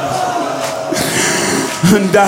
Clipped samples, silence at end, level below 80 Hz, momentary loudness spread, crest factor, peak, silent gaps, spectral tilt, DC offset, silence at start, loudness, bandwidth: under 0.1%; 0 s; -48 dBFS; 6 LU; 12 dB; 0 dBFS; none; -4 dB/octave; under 0.1%; 0 s; -14 LUFS; 16.5 kHz